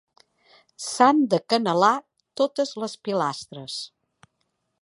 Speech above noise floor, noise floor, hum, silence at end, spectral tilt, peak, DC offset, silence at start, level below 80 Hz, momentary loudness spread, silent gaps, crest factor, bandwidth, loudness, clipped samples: 52 dB; -75 dBFS; none; 0.95 s; -4.5 dB/octave; -4 dBFS; under 0.1%; 0.8 s; -74 dBFS; 16 LU; none; 22 dB; 11.5 kHz; -23 LUFS; under 0.1%